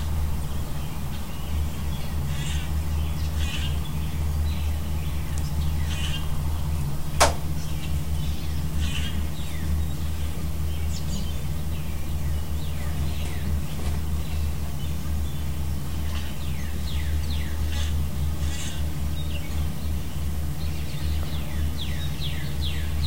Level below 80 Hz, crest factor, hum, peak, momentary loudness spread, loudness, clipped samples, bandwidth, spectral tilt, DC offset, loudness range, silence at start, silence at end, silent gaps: -30 dBFS; 24 dB; none; -4 dBFS; 3 LU; -29 LUFS; under 0.1%; 16 kHz; -5 dB/octave; 4%; 3 LU; 0 s; 0 s; none